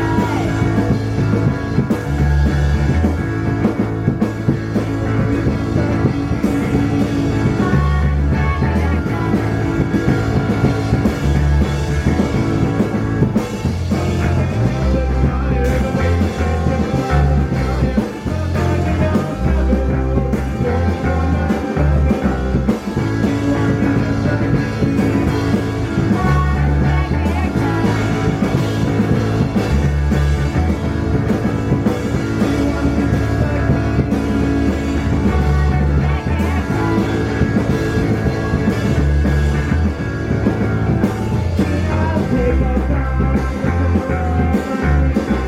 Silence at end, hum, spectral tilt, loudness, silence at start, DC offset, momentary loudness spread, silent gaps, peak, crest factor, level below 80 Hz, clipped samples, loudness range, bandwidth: 0 s; none; -8 dB/octave; -17 LUFS; 0 s; under 0.1%; 3 LU; none; 0 dBFS; 14 dB; -22 dBFS; under 0.1%; 1 LU; 13 kHz